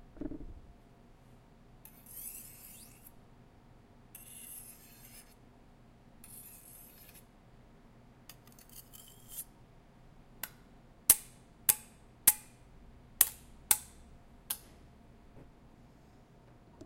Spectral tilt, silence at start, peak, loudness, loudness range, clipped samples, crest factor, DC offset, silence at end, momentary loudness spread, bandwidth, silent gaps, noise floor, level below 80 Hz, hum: -0.5 dB/octave; 0.15 s; -4 dBFS; -32 LUFS; 23 LU; under 0.1%; 36 dB; under 0.1%; 0 s; 28 LU; 16 kHz; none; -59 dBFS; -60 dBFS; none